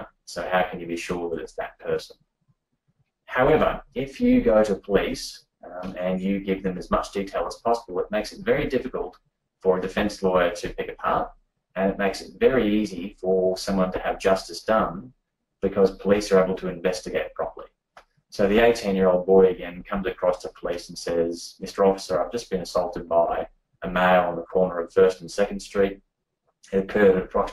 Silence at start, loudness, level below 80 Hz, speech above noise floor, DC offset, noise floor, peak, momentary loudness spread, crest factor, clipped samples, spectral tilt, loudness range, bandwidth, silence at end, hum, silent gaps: 0 s; -24 LUFS; -46 dBFS; 51 dB; under 0.1%; -75 dBFS; -4 dBFS; 13 LU; 20 dB; under 0.1%; -5.5 dB/octave; 4 LU; 14.5 kHz; 0 s; none; none